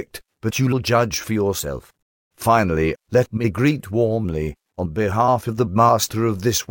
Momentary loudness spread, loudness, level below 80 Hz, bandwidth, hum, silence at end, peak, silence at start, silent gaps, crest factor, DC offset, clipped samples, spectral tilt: 10 LU; -20 LUFS; -42 dBFS; 17 kHz; none; 0.05 s; -4 dBFS; 0 s; 2.02-2.31 s; 16 dB; under 0.1%; under 0.1%; -5.5 dB/octave